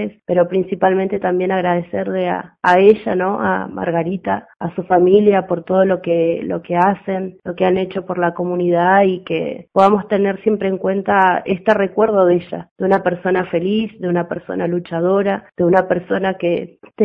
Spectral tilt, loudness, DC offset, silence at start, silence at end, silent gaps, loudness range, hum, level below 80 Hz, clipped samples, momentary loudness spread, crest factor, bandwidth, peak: -8.5 dB/octave; -17 LUFS; under 0.1%; 0 s; 0 s; 12.71-12.76 s; 2 LU; none; -54 dBFS; under 0.1%; 9 LU; 16 dB; 6.6 kHz; 0 dBFS